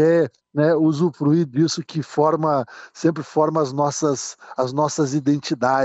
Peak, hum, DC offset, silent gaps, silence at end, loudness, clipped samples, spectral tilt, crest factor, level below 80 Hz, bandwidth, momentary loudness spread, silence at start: -4 dBFS; none; under 0.1%; none; 0 s; -21 LUFS; under 0.1%; -6 dB/octave; 14 dB; -68 dBFS; 8.2 kHz; 7 LU; 0 s